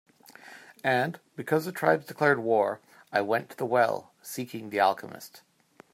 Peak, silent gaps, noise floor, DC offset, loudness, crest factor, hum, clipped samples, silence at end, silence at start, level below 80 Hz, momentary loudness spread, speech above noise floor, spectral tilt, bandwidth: -8 dBFS; none; -51 dBFS; under 0.1%; -28 LUFS; 22 dB; none; under 0.1%; 0.55 s; 0.45 s; -78 dBFS; 18 LU; 23 dB; -5 dB/octave; 16 kHz